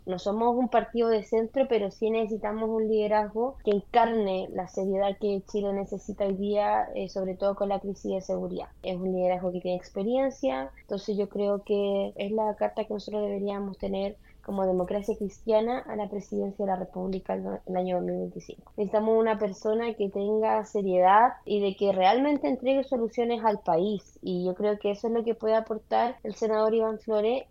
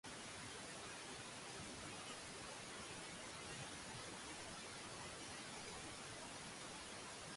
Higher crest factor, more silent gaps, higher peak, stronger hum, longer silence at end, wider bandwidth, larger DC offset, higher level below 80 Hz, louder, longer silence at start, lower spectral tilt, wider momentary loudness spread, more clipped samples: first, 18 dB vs 12 dB; neither; first, -8 dBFS vs -40 dBFS; neither; about the same, 0.05 s vs 0 s; second, 7.6 kHz vs 11.5 kHz; neither; first, -56 dBFS vs -72 dBFS; first, -28 LUFS vs -51 LUFS; about the same, 0.05 s vs 0.05 s; first, -7 dB/octave vs -2 dB/octave; first, 9 LU vs 1 LU; neither